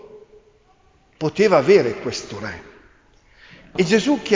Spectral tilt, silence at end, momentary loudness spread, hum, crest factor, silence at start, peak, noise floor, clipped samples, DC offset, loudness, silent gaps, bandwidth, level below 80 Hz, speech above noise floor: -5 dB/octave; 0 s; 17 LU; none; 18 dB; 0.15 s; -2 dBFS; -56 dBFS; under 0.1%; under 0.1%; -19 LUFS; none; 7.6 kHz; -54 dBFS; 38 dB